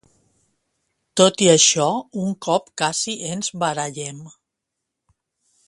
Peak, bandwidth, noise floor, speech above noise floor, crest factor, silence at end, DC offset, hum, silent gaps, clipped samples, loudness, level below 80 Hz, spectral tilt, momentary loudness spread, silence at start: 0 dBFS; 11.5 kHz; -81 dBFS; 61 dB; 22 dB; 1.4 s; under 0.1%; none; none; under 0.1%; -19 LUFS; -64 dBFS; -3 dB/octave; 15 LU; 1.15 s